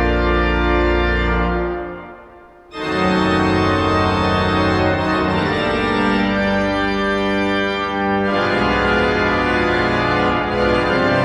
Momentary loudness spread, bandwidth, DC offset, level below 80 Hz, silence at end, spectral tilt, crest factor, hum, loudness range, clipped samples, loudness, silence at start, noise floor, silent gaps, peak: 4 LU; 11 kHz; under 0.1%; -28 dBFS; 0 s; -6.5 dB/octave; 14 dB; none; 2 LU; under 0.1%; -17 LUFS; 0 s; -42 dBFS; none; -4 dBFS